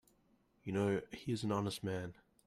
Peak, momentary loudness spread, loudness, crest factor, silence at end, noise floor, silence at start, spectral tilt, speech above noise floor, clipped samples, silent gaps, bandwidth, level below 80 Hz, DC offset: -24 dBFS; 10 LU; -39 LUFS; 16 dB; 0.35 s; -74 dBFS; 0.65 s; -6 dB/octave; 35 dB; under 0.1%; none; 15 kHz; -70 dBFS; under 0.1%